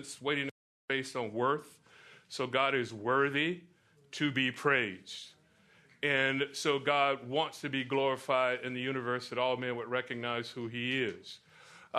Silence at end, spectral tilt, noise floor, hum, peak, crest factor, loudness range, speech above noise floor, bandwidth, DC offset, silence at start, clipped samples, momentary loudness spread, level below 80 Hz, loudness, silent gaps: 0 s; -4.5 dB/octave; -65 dBFS; none; -12 dBFS; 20 dB; 2 LU; 32 dB; 13.5 kHz; under 0.1%; 0 s; under 0.1%; 14 LU; -78 dBFS; -32 LUFS; 0.51-0.88 s